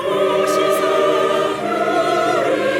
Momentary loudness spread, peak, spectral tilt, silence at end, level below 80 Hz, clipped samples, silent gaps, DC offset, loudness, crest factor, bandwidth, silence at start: 3 LU; -4 dBFS; -4 dB/octave; 0 s; -58 dBFS; under 0.1%; none; under 0.1%; -17 LUFS; 12 dB; 17 kHz; 0 s